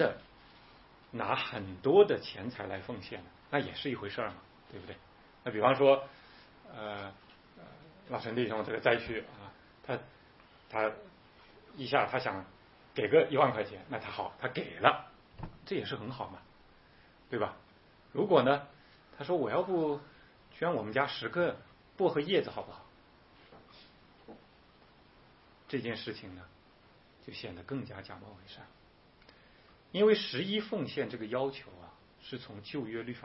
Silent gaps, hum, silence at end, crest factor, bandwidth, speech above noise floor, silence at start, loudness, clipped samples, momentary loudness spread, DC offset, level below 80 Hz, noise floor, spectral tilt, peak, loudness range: none; none; 0 s; 30 dB; 5.8 kHz; 29 dB; 0 s; -33 LUFS; under 0.1%; 23 LU; under 0.1%; -66 dBFS; -62 dBFS; -9 dB/octave; -6 dBFS; 12 LU